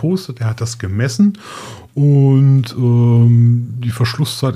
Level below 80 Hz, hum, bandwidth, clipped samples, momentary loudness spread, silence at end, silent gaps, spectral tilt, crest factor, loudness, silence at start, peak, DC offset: -52 dBFS; none; 13 kHz; under 0.1%; 12 LU; 0 s; none; -7 dB/octave; 12 dB; -14 LUFS; 0 s; -2 dBFS; under 0.1%